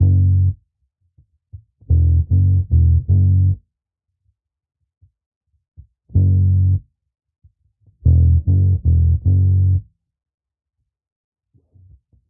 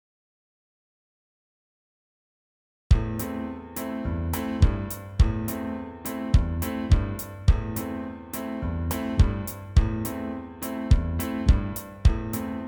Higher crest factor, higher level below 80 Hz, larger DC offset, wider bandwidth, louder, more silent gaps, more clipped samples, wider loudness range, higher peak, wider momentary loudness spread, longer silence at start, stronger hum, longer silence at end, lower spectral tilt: second, 14 dB vs 20 dB; about the same, -30 dBFS vs -28 dBFS; neither; second, 0.8 kHz vs over 20 kHz; first, -16 LUFS vs -27 LUFS; first, 5.26-5.41 s, 5.68-5.72 s vs none; neither; about the same, 5 LU vs 6 LU; about the same, -4 dBFS vs -6 dBFS; second, 7 LU vs 10 LU; second, 0 s vs 2.9 s; neither; first, 2.45 s vs 0 s; first, -18 dB/octave vs -6.5 dB/octave